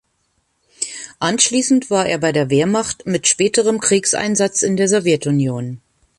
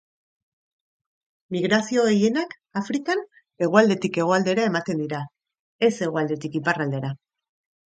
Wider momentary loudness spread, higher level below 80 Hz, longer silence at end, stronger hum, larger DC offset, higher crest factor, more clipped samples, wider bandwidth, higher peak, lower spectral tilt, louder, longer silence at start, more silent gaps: about the same, 11 LU vs 12 LU; first, -56 dBFS vs -68 dBFS; second, 0.4 s vs 0.7 s; neither; neither; about the same, 18 dB vs 22 dB; neither; first, 11.5 kHz vs 9.2 kHz; about the same, 0 dBFS vs -2 dBFS; second, -3.5 dB/octave vs -5.5 dB/octave; first, -16 LUFS vs -23 LUFS; second, 0.8 s vs 1.5 s; second, none vs 5.60-5.79 s